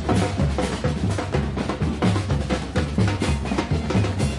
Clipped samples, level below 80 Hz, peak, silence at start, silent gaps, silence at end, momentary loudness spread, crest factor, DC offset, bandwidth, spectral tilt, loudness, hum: under 0.1%; -32 dBFS; -8 dBFS; 0 s; none; 0 s; 3 LU; 14 dB; under 0.1%; 11.5 kHz; -6.5 dB/octave; -23 LUFS; none